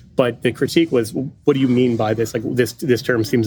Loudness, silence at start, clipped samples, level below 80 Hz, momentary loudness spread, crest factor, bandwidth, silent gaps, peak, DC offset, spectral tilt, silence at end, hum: -19 LUFS; 0.15 s; under 0.1%; -54 dBFS; 5 LU; 18 dB; 19.5 kHz; none; 0 dBFS; under 0.1%; -6 dB/octave; 0 s; none